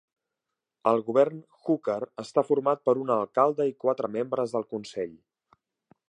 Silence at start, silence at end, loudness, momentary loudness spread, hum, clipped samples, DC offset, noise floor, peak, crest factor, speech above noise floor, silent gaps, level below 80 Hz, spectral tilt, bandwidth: 0.85 s; 1 s; -27 LUFS; 10 LU; none; under 0.1%; under 0.1%; -86 dBFS; -8 dBFS; 20 dB; 60 dB; none; -78 dBFS; -7 dB/octave; 10 kHz